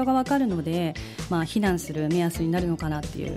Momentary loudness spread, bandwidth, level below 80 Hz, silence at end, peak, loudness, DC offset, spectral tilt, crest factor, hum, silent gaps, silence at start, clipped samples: 7 LU; 16 kHz; -44 dBFS; 0 s; -12 dBFS; -26 LUFS; under 0.1%; -6.5 dB/octave; 14 dB; none; none; 0 s; under 0.1%